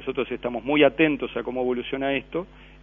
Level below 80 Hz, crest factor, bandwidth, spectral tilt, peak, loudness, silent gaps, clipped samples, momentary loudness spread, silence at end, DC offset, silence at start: -50 dBFS; 20 dB; 3.8 kHz; -8 dB/octave; -4 dBFS; -24 LUFS; none; under 0.1%; 12 LU; 0.15 s; under 0.1%; 0 s